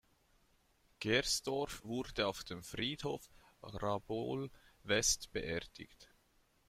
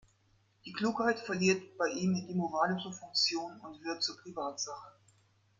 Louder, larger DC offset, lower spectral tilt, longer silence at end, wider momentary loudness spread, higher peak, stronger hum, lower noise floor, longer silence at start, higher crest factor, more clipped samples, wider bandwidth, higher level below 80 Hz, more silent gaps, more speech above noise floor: second, -38 LUFS vs -33 LUFS; neither; second, -2.5 dB/octave vs -4 dB/octave; about the same, 0.65 s vs 0.7 s; first, 18 LU vs 13 LU; about the same, -18 dBFS vs -16 dBFS; neither; about the same, -73 dBFS vs -70 dBFS; first, 1 s vs 0.65 s; about the same, 22 dB vs 20 dB; neither; first, 16 kHz vs 7.8 kHz; first, -60 dBFS vs -74 dBFS; neither; about the same, 34 dB vs 36 dB